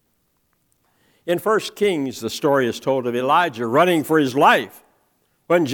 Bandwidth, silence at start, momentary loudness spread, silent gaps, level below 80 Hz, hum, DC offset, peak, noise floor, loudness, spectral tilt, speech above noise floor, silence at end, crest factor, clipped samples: 19.5 kHz; 1.25 s; 9 LU; none; -68 dBFS; none; under 0.1%; -2 dBFS; -67 dBFS; -19 LUFS; -5 dB/octave; 48 dB; 0 s; 18 dB; under 0.1%